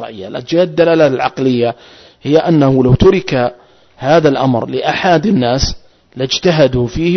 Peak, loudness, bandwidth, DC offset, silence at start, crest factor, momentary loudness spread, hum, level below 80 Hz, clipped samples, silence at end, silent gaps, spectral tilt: 0 dBFS; -12 LUFS; 6.4 kHz; under 0.1%; 0 s; 12 dB; 10 LU; none; -32 dBFS; under 0.1%; 0 s; none; -6 dB/octave